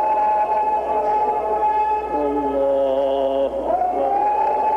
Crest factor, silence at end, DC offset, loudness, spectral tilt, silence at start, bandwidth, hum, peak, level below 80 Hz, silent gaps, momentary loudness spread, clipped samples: 10 dB; 0 s; under 0.1%; -20 LUFS; -6.5 dB/octave; 0 s; 6.4 kHz; none; -10 dBFS; -46 dBFS; none; 3 LU; under 0.1%